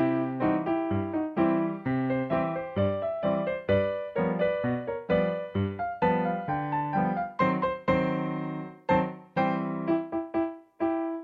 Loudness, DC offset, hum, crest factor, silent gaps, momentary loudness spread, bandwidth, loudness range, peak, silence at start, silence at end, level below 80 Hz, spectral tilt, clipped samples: -29 LUFS; under 0.1%; none; 16 dB; none; 5 LU; 5.2 kHz; 1 LU; -12 dBFS; 0 s; 0 s; -56 dBFS; -9.5 dB/octave; under 0.1%